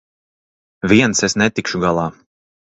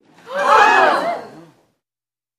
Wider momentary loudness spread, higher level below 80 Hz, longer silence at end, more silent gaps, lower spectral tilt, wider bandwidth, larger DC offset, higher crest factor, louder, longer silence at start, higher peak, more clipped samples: second, 11 LU vs 17 LU; first, -46 dBFS vs -60 dBFS; second, 0.5 s vs 1.1 s; neither; first, -4 dB/octave vs -2.5 dB/octave; second, 8.2 kHz vs 14 kHz; neither; about the same, 18 dB vs 16 dB; about the same, -16 LUFS vs -14 LUFS; first, 0.85 s vs 0.25 s; about the same, 0 dBFS vs 0 dBFS; neither